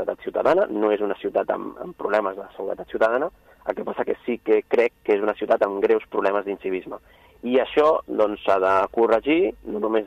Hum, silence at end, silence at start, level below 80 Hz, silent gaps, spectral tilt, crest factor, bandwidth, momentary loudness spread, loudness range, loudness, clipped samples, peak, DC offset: none; 0 s; 0 s; -58 dBFS; none; -6.5 dB/octave; 16 dB; 8.2 kHz; 11 LU; 4 LU; -23 LUFS; under 0.1%; -6 dBFS; under 0.1%